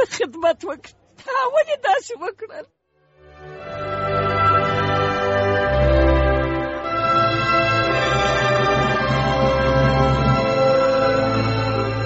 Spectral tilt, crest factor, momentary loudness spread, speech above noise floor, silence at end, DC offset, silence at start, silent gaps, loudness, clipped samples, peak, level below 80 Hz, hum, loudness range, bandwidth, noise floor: -4.5 dB/octave; 14 dB; 13 LU; 32 dB; 0 s; under 0.1%; 0 s; none; -18 LUFS; under 0.1%; -4 dBFS; -30 dBFS; none; 6 LU; 8 kHz; -55 dBFS